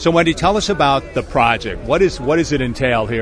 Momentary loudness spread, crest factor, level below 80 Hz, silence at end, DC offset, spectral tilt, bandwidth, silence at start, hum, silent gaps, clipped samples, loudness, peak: 4 LU; 16 dB; -32 dBFS; 0 s; under 0.1%; -5 dB/octave; 11 kHz; 0 s; none; none; under 0.1%; -16 LUFS; 0 dBFS